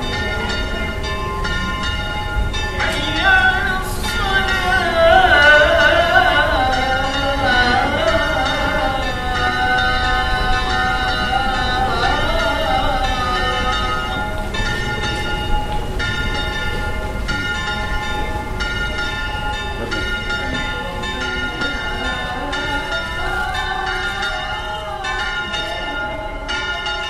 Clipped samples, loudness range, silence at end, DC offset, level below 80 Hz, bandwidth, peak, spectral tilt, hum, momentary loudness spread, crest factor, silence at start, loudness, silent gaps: under 0.1%; 9 LU; 0 s; under 0.1%; -26 dBFS; 15 kHz; 0 dBFS; -4 dB/octave; none; 10 LU; 18 dB; 0 s; -18 LUFS; none